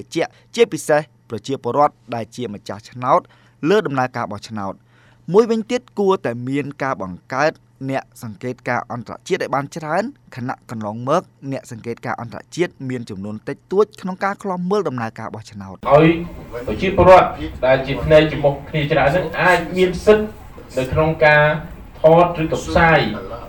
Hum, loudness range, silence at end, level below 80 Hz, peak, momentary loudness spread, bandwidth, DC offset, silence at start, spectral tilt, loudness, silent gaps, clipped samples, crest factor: none; 9 LU; 0 s; -40 dBFS; -2 dBFS; 16 LU; over 20 kHz; under 0.1%; 0 s; -6 dB/octave; -18 LUFS; none; under 0.1%; 16 dB